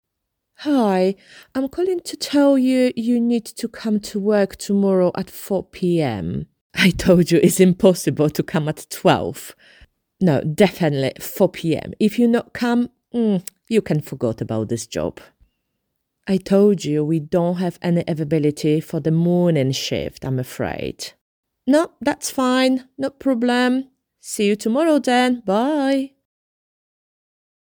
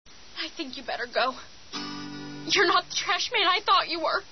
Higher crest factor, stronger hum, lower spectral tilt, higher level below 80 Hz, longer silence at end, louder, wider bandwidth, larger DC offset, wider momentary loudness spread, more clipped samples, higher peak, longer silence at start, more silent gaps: about the same, 18 dB vs 18 dB; neither; first, -6 dB/octave vs -1.5 dB/octave; first, -50 dBFS vs -62 dBFS; first, 1.55 s vs 0 s; first, -19 LUFS vs -25 LUFS; first, over 20 kHz vs 6.4 kHz; second, under 0.1% vs 0.4%; second, 11 LU vs 16 LU; neither; first, -2 dBFS vs -10 dBFS; first, 0.6 s vs 0.1 s; first, 6.61-6.70 s, 21.21-21.43 s vs none